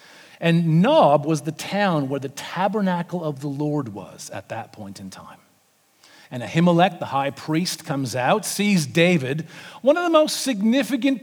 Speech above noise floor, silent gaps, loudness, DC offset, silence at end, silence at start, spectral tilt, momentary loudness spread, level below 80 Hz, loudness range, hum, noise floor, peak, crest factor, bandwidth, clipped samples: 40 dB; none; -21 LUFS; under 0.1%; 0.05 s; 0.4 s; -5.5 dB/octave; 17 LU; -72 dBFS; 9 LU; none; -61 dBFS; -4 dBFS; 18 dB; 19.5 kHz; under 0.1%